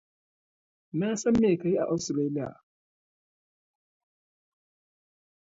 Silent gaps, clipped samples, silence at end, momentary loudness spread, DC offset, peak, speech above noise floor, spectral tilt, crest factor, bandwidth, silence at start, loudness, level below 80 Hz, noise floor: none; under 0.1%; 3.05 s; 11 LU; under 0.1%; -14 dBFS; over 64 dB; -6 dB/octave; 18 dB; 8 kHz; 0.95 s; -27 LUFS; -62 dBFS; under -90 dBFS